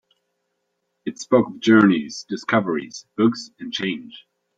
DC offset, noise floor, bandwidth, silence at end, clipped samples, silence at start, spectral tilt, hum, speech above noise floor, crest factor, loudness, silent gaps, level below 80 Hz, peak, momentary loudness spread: under 0.1%; -75 dBFS; 7.8 kHz; 0.4 s; under 0.1%; 1.05 s; -5.5 dB/octave; none; 54 dB; 20 dB; -20 LUFS; none; -66 dBFS; -2 dBFS; 18 LU